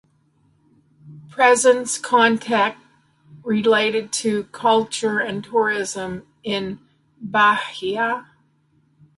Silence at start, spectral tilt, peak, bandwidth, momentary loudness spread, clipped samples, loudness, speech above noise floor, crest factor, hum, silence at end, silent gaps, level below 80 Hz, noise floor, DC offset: 1.05 s; -3 dB/octave; -2 dBFS; 11.5 kHz; 14 LU; under 0.1%; -19 LUFS; 42 dB; 20 dB; none; 0.95 s; none; -64 dBFS; -61 dBFS; under 0.1%